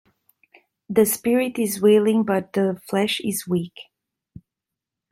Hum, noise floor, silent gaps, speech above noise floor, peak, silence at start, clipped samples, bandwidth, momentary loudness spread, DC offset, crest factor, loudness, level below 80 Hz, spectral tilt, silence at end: none; -86 dBFS; none; 65 dB; -4 dBFS; 0.9 s; under 0.1%; 16.5 kHz; 8 LU; under 0.1%; 18 dB; -21 LUFS; -64 dBFS; -5 dB/octave; 1.3 s